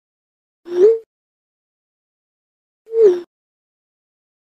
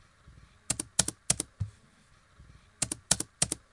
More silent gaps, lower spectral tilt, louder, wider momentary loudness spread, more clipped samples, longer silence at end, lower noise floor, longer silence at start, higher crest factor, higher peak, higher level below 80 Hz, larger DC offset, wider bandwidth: first, 1.06-2.85 s vs none; first, -6 dB/octave vs -1.5 dB/octave; first, -16 LUFS vs -31 LUFS; about the same, 11 LU vs 9 LU; neither; first, 1.2 s vs 0.15 s; first, under -90 dBFS vs -62 dBFS; about the same, 0.65 s vs 0.7 s; second, 18 dB vs 30 dB; about the same, -2 dBFS vs -4 dBFS; second, -74 dBFS vs -54 dBFS; neither; second, 7 kHz vs 11.5 kHz